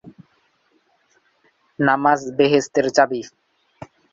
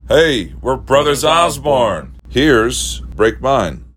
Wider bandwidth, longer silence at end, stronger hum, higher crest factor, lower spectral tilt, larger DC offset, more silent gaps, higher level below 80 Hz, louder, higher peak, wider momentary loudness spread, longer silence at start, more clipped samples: second, 7.8 kHz vs 16.5 kHz; first, 0.85 s vs 0.1 s; neither; first, 20 dB vs 14 dB; about the same, -5 dB/octave vs -4 dB/octave; neither; neither; second, -64 dBFS vs -30 dBFS; second, -18 LUFS vs -14 LUFS; about the same, -2 dBFS vs 0 dBFS; about the same, 7 LU vs 9 LU; about the same, 0.05 s vs 0.05 s; neither